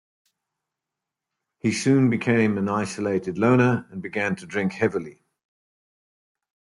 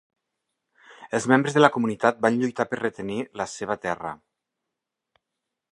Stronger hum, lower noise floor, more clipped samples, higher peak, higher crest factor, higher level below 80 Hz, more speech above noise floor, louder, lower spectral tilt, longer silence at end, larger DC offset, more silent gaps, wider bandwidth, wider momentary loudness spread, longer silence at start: neither; about the same, -86 dBFS vs -84 dBFS; neither; second, -6 dBFS vs 0 dBFS; second, 18 dB vs 26 dB; about the same, -66 dBFS vs -66 dBFS; about the same, 64 dB vs 61 dB; about the same, -23 LUFS vs -24 LUFS; about the same, -6.5 dB/octave vs -5.5 dB/octave; about the same, 1.6 s vs 1.55 s; neither; neither; about the same, 11.5 kHz vs 11.5 kHz; second, 9 LU vs 12 LU; first, 1.65 s vs 0.9 s